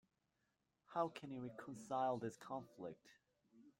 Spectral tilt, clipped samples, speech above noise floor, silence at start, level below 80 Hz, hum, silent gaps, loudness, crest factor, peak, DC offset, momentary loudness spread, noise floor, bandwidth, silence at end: -6 dB/octave; under 0.1%; 40 dB; 0.9 s; -86 dBFS; none; none; -47 LUFS; 22 dB; -26 dBFS; under 0.1%; 13 LU; -87 dBFS; 16.5 kHz; 0.1 s